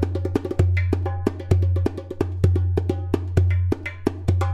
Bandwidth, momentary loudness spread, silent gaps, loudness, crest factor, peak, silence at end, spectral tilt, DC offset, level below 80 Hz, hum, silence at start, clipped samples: 8 kHz; 6 LU; none; -23 LUFS; 18 dB; -4 dBFS; 0 s; -8.5 dB/octave; under 0.1%; -34 dBFS; none; 0 s; under 0.1%